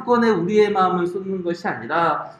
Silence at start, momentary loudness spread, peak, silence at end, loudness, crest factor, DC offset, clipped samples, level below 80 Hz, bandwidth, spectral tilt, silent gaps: 0 s; 8 LU; -6 dBFS; 0.05 s; -20 LUFS; 14 dB; under 0.1%; under 0.1%; -62 dBFS; 9.2 kHz; -7 dB/octave; none